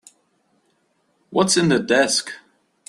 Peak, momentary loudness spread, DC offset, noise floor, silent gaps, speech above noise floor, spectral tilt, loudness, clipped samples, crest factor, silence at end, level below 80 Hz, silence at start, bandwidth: -2 dBFS; 16 LU; under 0.1%; -66 dBFS; none; 48 dB; -3.5 dB/octave; -18 LUFS; under 0.1%; 20 dB; 0.5 s; -62 dBFS; 1.3 s; 13 kHz